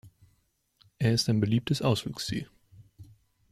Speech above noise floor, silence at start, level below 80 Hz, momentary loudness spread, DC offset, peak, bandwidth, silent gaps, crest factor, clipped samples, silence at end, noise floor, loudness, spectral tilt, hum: 44 dB; 0.05 s; -58 dBFS; 10 LU; under 0.1%; -14 dBFS; 14.5 kHz; none; 18 dB; under 0.1%; 0.5 s; -72 dBFS; -28 LUFS; -5.5 dB/octave; none